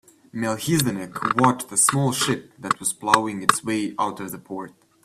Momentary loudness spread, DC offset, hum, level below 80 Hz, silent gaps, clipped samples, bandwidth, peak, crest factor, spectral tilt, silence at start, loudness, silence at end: 15 LU; under 0.1%; none; -60 dBFS; none; under 0.1%; 15.5 kHz; 0 dBFS; 24 dB; -3.5 dB/octave; 0.35 s; -22 LUFS; 0.35 s